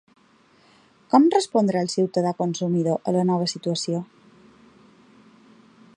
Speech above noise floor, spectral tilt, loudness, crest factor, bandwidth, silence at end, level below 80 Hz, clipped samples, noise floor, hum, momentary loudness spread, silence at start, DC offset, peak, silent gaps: 36 dB; -6 dB/octave; -22 LUFS; 20 dB; 11 kHz; 1.9 s; -72 dBFS; under 0.1%; -58 dBFS; none; 9 LU; 1.15 s; under 0.1%; -4 dBFS; none